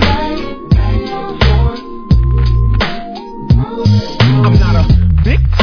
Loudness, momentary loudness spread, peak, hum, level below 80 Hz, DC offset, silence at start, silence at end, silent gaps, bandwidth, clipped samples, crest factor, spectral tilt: -12 LUFS; 11 LU; 0 dBFS; none; -14 dBFS; under 0.1%; 0 s; 0 s; none; 5.4 kHz; 0.1%; 10 dB; -7.5 dB/octave